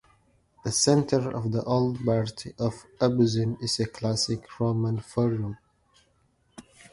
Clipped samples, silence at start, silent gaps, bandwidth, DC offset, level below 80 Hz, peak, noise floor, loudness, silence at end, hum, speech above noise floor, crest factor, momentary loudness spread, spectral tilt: under 0.1%; 0.65 s; none; 11.5 kHz; under 0.1%; -56 dBFS; -8 dBFS; -67 dBFS; -27 LUFS; 0.3 s; none; 41 dB; 20 dB; 9 LU; -5.5 dB/octave